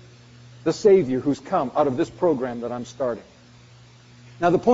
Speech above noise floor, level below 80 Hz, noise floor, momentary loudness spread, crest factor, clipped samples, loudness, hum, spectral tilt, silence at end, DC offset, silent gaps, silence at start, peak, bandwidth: 28 dB; -58 dBFS; -49 dBFS; 11 LU; 18 dB; under 0.1%; -23 LUFS; none; -6.5 dB/octave; 0 s; under 0.1%; none; 0.65 s; -4 dBFS; 8 kHz